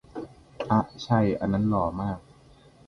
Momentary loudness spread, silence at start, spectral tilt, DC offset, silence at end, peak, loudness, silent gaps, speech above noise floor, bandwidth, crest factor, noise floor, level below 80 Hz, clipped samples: 17 LU; 0.15 s; -8 dB/octave; under 0.1%; 0.7 s; -8 dBFS; -26 LUFS; none; 29 dB; 6.6 kHz; 20 dB; -54 dBFS; -50 dBFS; under 0.1%